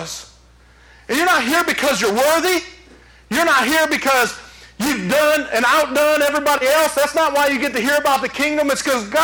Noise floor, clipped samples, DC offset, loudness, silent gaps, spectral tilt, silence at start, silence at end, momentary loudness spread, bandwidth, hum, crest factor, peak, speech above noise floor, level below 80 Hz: -48 dBFS; under 0.1%; under 0.1%; -16 LUFS; none; -2.5 dB/octave; 0 s; 0 s; 7 LU; over 20 kHz; none; 12 dB; -4 dBFS; 32 dB; -50 dBFS